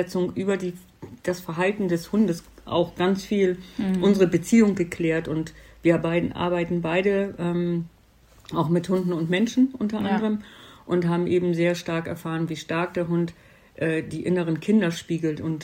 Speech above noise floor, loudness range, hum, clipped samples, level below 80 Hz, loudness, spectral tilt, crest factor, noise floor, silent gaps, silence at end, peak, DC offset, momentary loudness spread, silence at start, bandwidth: 31 dB; 3 LU; none; under 0.1%; -54 dBFS; -24 LUFS; -6.5 dB/octave; 18 dB; -55 dBFS; none; 0 s; -6 dBFS; under 0.1%; 9 LU; 0 s; 16 kHz